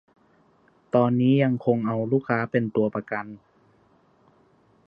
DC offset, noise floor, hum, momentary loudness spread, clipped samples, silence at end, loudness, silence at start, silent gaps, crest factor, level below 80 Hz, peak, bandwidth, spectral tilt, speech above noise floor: under 0.1%; -61 dBFS; none; 11 LU; under 0.1%; 1.5 s; -24 LUFS; 0.95 s; none; 20 dB; -68 dBFS; -6 dBFS; 5 kHz; -10.5 dB/octave; 38 dB